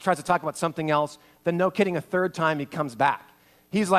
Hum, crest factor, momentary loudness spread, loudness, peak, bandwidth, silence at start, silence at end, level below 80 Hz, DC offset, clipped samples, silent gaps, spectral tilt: none; 20 dB; 7 LU; -26 LUFS; -6 dBFS; 15 kHz; 0 s; 0 s; -68 dBFS; under 0.1%; under 0.1%; none; -5.5 dB/octave